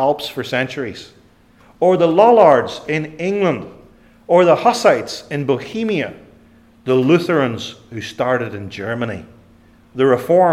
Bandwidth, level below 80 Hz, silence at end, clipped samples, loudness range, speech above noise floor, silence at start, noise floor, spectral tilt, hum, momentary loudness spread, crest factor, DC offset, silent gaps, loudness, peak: 15 kHz; -56 dBFS; 0 s; under 0.1%; 5 LU; 34 dB; 0 s; -50 dBFS; -6 dB/octave; none; 17 LU; 16 dB; under 0.1%; none; -16 LUFS; 0 dBFS